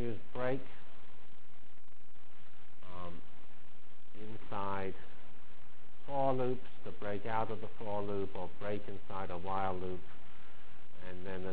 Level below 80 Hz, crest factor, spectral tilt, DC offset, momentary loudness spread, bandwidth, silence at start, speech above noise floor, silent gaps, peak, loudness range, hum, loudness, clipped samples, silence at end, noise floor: -62 dBFS; 22 dB; -9 dB/octave; 4%; 24 LU; 4 kHz; 0 s; 25 dB; none; -18 dBFS; 16 LU; none; -40 LUFS; under 0.1%; 0 s; -65 dBFS